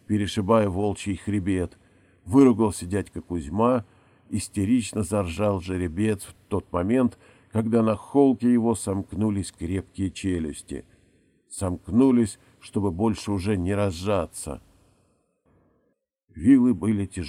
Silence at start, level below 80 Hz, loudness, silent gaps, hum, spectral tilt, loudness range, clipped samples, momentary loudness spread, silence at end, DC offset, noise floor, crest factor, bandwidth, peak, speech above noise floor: 0.1 s; -48 dBFS; -24 LUFS; none; none; -6.5 dB/octave; 4 LU; under 0.1%; 13 LU; 0 s; under 0.1%; -72 dBFS; 20 dB; 13.5 kHz; -4 dBFS; 49 dB